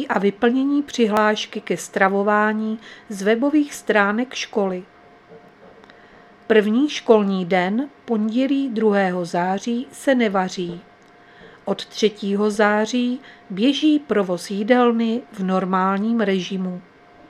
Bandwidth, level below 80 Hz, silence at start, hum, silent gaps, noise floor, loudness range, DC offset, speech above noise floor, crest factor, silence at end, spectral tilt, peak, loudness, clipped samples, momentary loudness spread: 13.5 kHz; -66 dBFS; 0 s; none; none; -49 dBFS; 3 LU; under 0.1%; 29 dB; 20 dB; 0.5 s; -5.5 dB/octave; 0 dBFS; -20 LUFS; under 0.1%; 10 LU